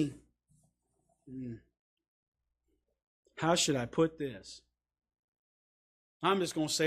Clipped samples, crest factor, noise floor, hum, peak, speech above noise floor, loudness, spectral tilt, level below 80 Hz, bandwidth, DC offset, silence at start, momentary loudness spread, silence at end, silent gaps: under 0.1%; 24 dB; -81 dBFS; 60 Hz at -65 dBFS; -14 dBFS; 49 dB; -32 LUFS; -4 dB/octave; -68 dBFS; 15 kHz; under 0.1%; 0 s; 22 LU; 0 s; 1.79-1.97 s, 2.08-2.32 s, 3.03-3.23 s, 5.19-5.33 s, 5.39-6.20 s